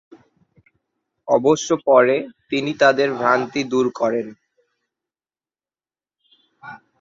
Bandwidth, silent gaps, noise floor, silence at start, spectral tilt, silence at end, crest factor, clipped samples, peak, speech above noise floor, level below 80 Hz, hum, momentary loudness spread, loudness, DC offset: 7.6 kHz; none; under -90 dBFS; 1.25 s; -4.5 dB/octave; 0.25 s; 20 dB; under 0.1%; -2 dBFS; over 72 dB; -66 dBFS; none; 21 LU; -18 LUFS; under 0.1%